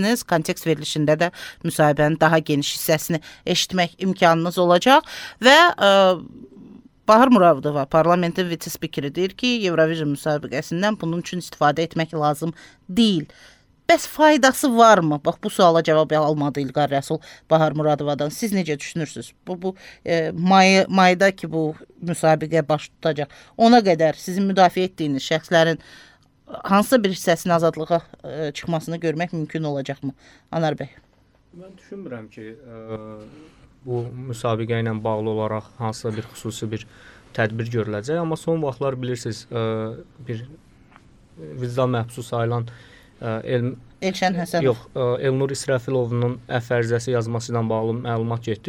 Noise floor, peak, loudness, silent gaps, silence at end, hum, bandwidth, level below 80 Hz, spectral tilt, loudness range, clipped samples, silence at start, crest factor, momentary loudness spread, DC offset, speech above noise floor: -57 dBFS; -2 dBFS; -20 LUFS; none; 0 s; none; over 20 kHz; -56 dBFS; -5 dB/octave; 11 LU; under 0.1%; 0 s; 20 dB; 16 LU; under 0.1%; 36 dB